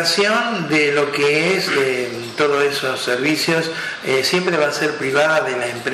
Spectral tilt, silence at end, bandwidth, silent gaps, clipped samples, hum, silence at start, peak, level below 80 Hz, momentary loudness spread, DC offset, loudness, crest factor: -3.5 dB/octave; 0 s; 13.5 kHz; none; under 0.1%; none; 0 s; -2 dBFS; -62 dBFS; 5 LU; under 0.1%; -17 LUFS; 16 dB